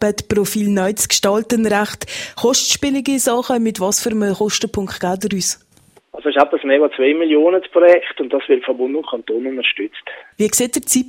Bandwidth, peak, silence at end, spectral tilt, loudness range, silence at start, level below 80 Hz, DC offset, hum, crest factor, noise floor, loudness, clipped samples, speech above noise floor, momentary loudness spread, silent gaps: 16.5 kHz; 0 dBFS; 0 s; -3 dB/octave; 3 LU; 0 s; -52 dBFS; under 0.1%; none; 16 dB; -52 dBFS; -16 LUFS; under 0.1%; 35 dB; 9 LU; none